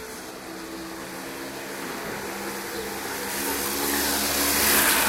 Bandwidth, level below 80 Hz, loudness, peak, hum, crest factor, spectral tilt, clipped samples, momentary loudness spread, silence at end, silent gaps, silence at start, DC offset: 16 kHz; -50 dBFS; -25 LUFS; -8 dBFS; none; 20 dB; -1 dB/octave; under 0.1%; 17 LU; 0 s; none; 0 s; under 0.1%